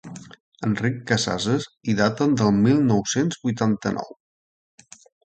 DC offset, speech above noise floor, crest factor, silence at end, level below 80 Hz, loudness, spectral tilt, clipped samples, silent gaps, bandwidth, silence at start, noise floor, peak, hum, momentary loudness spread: under 0.1%; over 69 dB; 18 dB; 1.2 s; -54 dBFS; -22 LUFS; -5.5 dB/octave; under 0.1%; 0.40-0.52 s; 9 kHz; 0.05 s; under -90 dBFS; -4 dBFS; none; 12 LU